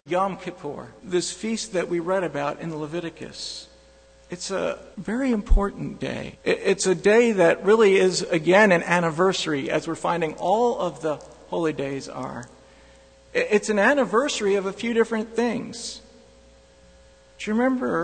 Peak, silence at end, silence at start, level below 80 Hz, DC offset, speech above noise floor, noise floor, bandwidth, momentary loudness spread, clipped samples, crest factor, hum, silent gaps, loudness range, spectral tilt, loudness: -4 dBFS; 0 s; 0.05 s; -36 dBFS; under 0.1%; 30 dB; -53 dBFS; 9.4 kHz; 16 LU; under 0.1%; 18 dB; none; none; 10 LU; -4.5 dB/octave; -23 LUFS